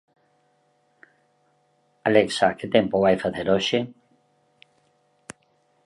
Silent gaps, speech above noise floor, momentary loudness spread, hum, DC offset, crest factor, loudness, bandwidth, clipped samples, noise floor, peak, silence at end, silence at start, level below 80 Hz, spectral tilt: none; 45 dB; 22 LU; none; under 0.1%; 22 dB; -22 LUFS; 11.5 kHz; under 0.1%; -66 dBFS; -4 dBFS; 1.95 s; 2.05 s; -60 dBFS; -5 dB/octave